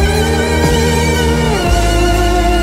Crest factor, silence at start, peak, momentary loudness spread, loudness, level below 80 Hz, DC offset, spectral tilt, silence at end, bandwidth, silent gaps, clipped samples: 10 dB; 0 s; -2 dBFS; 1 LU; -13 LUFS; -16 dBFS; under 0.1%; -5 dB/octave; 0 s; 16 kHz; none; under 0.1%